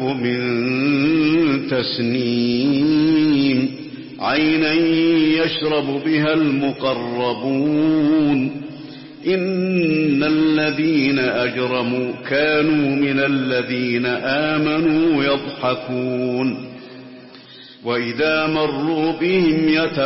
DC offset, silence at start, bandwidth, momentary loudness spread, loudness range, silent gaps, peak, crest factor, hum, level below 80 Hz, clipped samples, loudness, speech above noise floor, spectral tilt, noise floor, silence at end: under 0.1%; 0 s; 5.8 kHz; 7 LU; 4 LU; none; -6 dBFS; 12 dB; none; -54 dBFS; under 0.1%; -18 LUFS; 23 dB; -9.5 dB/octave; -41 dBFS; 0 s